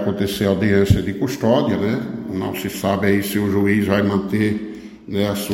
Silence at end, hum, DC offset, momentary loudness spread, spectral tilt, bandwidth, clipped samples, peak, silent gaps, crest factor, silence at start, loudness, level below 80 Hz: 0 s; none; under 0.1%; 8 LU; -6.5 dB/octave; 16.5 kHz; under 0.1%; 0 dBFS; none; 18 dB; 0 s; -19 LUFS; -40 dBFS